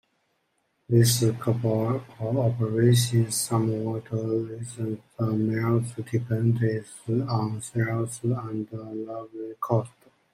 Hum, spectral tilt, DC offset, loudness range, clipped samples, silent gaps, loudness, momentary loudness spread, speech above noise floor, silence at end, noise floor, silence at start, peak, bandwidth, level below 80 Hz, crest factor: none; -6 dB/octave; under 0.1%; 5 LU; under 0.1%; none; -26 LUFS; 13 LU; 47 dB; 0.45 s; -73 dBFS; 0.9 s; -8 dBFS; 16 kHz; -64 dBFS; 18 dB